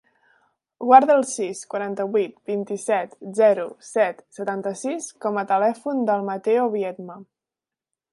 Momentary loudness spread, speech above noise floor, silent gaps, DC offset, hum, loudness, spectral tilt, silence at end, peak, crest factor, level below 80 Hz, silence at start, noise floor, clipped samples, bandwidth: 13 LU; 68 dB; none; under 0.1%; none; -22 LUFS; -5 dB/octave; 0.9 s; 0 dBFS; 22 dB; -78 dBFS; 0.8 s; -89 dBFS; under 0.1%; 11.5 kHz